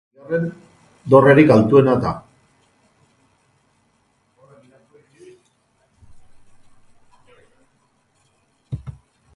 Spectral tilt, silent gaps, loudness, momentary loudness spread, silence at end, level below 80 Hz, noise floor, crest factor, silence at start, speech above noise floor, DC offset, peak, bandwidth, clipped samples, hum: -8.5 dB/octave; none; -15 LUFS; 23 LU; 0.45 s; -52 dBFS; -63 dBFS; 22 dB; 0.3 s; 50 dB; under 0.1%; 0 dBFS; 11.5 kHz; under 0.1%; none